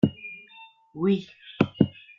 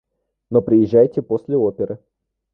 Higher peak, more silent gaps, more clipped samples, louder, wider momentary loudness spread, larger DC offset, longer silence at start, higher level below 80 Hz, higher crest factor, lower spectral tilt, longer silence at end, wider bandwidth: about the same, -4 dBFS vs -2 dBFS; neither; neither; second, -26 LUFS vs -18 LUFS; first, 21 LU vs 12 LU; neither; second, 0.05 s vs 0.5 s; second, -60 dBFS vs -54 dBFS; first, 24 dB vs 16 dB; second, -9 dB/octave vs -11.5 dB/octave; second, 0.3 s vs 0.6 s; first, 6.6 kHz vs 5.4 kHz